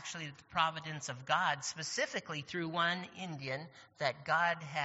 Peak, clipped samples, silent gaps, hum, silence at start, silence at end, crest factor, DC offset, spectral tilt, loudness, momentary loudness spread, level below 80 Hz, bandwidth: -16 dBFS; under 0.1%; none; none; 0 s; 0 s; 22 dB; under 0.1%; -2 dB/octave; -36 LUFS; 11 LU; -76 dBFS; 8 kHz